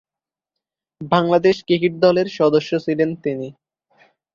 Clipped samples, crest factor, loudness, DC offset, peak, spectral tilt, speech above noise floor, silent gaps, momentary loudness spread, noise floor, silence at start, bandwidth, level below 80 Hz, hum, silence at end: under 0.1%; 18 dB; -18 LUFS; under 0.1%; -2 dBFS; -7 dB/octave; 72 dB; none; 11 LU; -90 dBFS; 1 s; 7.2 kHz; -60 dBFS; none; 0.85 s